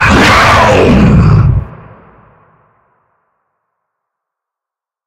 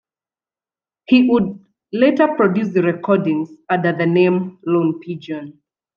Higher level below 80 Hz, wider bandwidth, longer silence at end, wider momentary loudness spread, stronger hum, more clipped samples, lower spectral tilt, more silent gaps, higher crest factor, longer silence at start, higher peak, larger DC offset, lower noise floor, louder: first, -22 dBFS vs -62 dBFS; first, 16 kHz vs 6.6 kHz; first, 3.35 s vs 0.45 s; second, 9 LU vs 13 LU; neither; first, 0.2% vs under 0.1%; second, -6 dB/octave vs -9 dB/octave; neither; second, 10 dB vs 16 dB; second, 0 s vs 1.1 s; about the same, 0 dBFS vs -2 dBFS; neither; second, -85 dBFS vs under -90 dBFS; first, -6 LUFS vs -17 LUFS